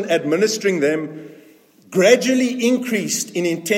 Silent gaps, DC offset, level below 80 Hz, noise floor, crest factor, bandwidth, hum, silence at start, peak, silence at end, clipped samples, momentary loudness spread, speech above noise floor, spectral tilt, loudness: none; under 0.1%; -70 dBFS; -49 dBFS; 18 dB; 16.5 kHz; none; 0 s; 0 dBFS; 0 s; under 0.1%; 10 LU; 31 dB; -4 dB/octave; -18 LUFS